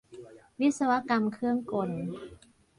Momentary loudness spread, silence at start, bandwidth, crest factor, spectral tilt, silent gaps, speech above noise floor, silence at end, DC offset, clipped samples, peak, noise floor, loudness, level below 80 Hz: 23 LU; 0.1 s; 11.5 kHz; 18 dB; -6 dB/octave; none; 21 dB; 0.45 s; under 0.1%; under 0.1%; -14 dBFS; -50 dBFS; -29 LUFS; -66 dBFS